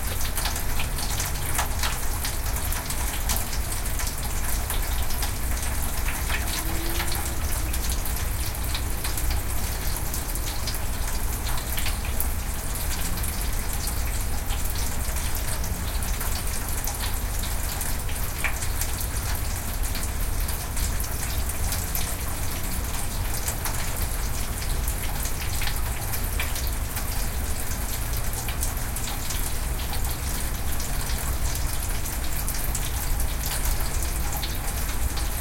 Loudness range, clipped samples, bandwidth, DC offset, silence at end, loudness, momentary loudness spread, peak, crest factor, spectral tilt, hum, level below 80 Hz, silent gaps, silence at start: 1 LU; under 0.1%; 17 kHz; under 0.1%; 0 s; -28 LUFS; 2 LU; -4 dBFS; 20 dB; -3 dB/octave; none; -28 dBFS; none; 0 s